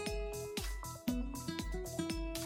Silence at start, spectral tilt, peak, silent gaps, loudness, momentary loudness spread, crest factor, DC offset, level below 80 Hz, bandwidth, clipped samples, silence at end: 0 s; -4.5 dB/octave; -24 dBFS; none; -41 LUFS; 2 LU; 16 dB; under 0.1%; -44 dBFS; 16.5 kHz; under 0.1%; 0 s